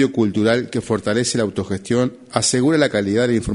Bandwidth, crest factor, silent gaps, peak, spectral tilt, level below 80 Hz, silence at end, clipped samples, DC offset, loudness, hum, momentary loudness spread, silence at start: 11 kHz; 18 dB; none; 0 dBFS; -4.5 dB/octave; -44 dBFS; 0 s; under 0.1%; under 0.1%; -19 LUFS; none; 6 LU; 0 s